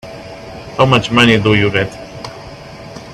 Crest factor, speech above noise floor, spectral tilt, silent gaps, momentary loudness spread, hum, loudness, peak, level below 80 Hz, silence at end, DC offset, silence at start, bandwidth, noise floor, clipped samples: 16 dB; 20 dB; -5.5 dB/octave; none; 22 LU; none; -12 LUFS; 0 dBFS; -40 dBFS; 0 s; under 0.1%; 0.05 s; 13.5 kHz; -32 dBFS; under 0.1%